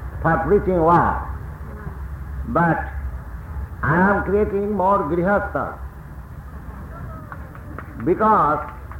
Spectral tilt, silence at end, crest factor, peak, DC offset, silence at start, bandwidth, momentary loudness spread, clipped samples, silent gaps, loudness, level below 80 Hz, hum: -9.5 dB/octave; 0 s; 16 dB; -6 dBFS; under 0.1%; 0 s; 16.5 kHz; 20 LU; under 0.1%; none; -19 LUFS; -34 dBFS; none